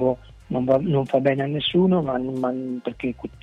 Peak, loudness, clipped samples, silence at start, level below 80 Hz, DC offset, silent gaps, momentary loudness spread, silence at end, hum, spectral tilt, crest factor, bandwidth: -6 dBFS; -23 LUFS; under 0.1%; 0 s; -50 dBFS; under 0.1%; none; 10 LU; 0.15 s; none; -8.5 dB/octave; 16 dB; 6.8 kHz